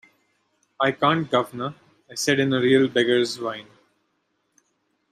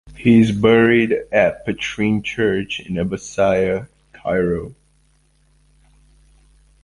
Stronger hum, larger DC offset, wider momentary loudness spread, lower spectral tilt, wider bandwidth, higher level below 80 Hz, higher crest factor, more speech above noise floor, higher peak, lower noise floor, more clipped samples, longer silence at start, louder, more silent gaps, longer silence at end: neither; neither; first, 14 LU vs 11 LU; second, -4.5 dB/octave vs -6.5 dB/octave; first, 15 kHz vs 11 kHz; second, -68 dBFS vs -44 dBFS; about the same, 20 dB vs 18 dB; first, 50 dB vs 41 dB; second, -6 dBFS vs -2 dBFS; first, -72 dBFS vs -58 dBFS; neither; first, 0.8 s vs 0.05 s; second, -22 LUFS vs -18 LUFS; neither; second, 1.5 s vs 2.1 s